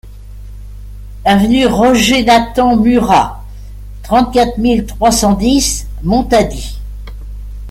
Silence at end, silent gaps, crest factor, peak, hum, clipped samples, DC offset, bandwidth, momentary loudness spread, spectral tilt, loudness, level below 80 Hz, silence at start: 0 s; none; 12 dB; 0 dBFS; 50 Hz at -25 dBFS; under 0.1%; under 0.1%; 16 kHz; 23 LU; -4.5 dB/octave; -11 LUFS; -26 dBFS; 0.05 s